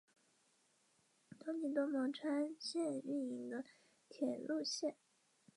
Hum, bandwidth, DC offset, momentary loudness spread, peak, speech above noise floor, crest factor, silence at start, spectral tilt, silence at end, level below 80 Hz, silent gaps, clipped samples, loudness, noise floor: none; 11.5 kHz; under 0.1%; 8 LU; -26 dBFS; 36 dB; 18 dB; 1.3 s; -3.5 dB/octave; 0.65 s; under -90 dBFS; none; under 0.1%; -42 LUFS; -77 dBFS